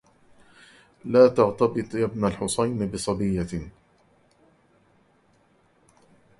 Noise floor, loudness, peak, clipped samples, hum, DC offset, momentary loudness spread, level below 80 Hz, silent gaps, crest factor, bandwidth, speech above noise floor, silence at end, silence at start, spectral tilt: -62 dBFS; -23 LUFS; -4 dBFS; under 0.1%; none; under 0.1%; 15 LU; -50 dBFS; none; 22 dB; 11.5 kHz; 40 dB; 2.7 s; 1.05 s; -6 dB/octave